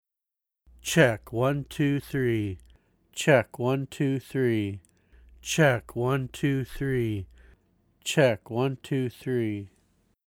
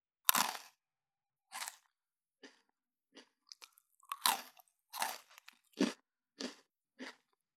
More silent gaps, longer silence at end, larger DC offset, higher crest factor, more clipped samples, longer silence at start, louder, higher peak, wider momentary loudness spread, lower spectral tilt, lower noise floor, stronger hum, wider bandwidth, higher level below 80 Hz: neither; first, 0.6 s vs 0.45 s; neither; second, 20 dB vs 40 dB; neither; first, 0.85 s vs 0.25 s; first, -27 LUFS vs -37 LUFS; about the same, -6 dBFS vs -4 dBFS; second, 14 LU vs 25 LU; first, -5.5 dB/octave vs -1 dB/octave; about the same, -88 dBFS vs under -90 dBFS; neither; second, 17.5 kHz vs 19.5 kHz; first, -54 dBFS vs under -90 dBFS